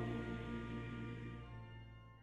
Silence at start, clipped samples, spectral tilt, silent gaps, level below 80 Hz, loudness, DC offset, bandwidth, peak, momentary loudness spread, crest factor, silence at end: 0 s; under 0.1%; -8 dB/octave; none; -58 dBFS; -48 LUFS; under 0.1%; 8.4 kHz; -30 dBFS; 11 LU; 16 dB; 0 s